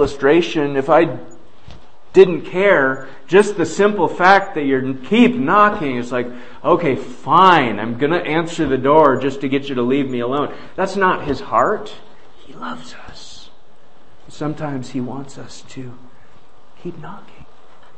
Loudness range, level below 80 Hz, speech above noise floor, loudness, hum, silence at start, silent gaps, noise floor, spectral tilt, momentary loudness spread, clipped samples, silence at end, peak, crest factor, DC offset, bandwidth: 15 LU; -48 dBFS; 35 dB; -16 LUFS; none; 0 s; none; -51 dBFS; -6 dB/octave; 21 LU; under 0.1%; 0.55 s; 0 dBFS; 18 dB; 3%; 8.8 kHz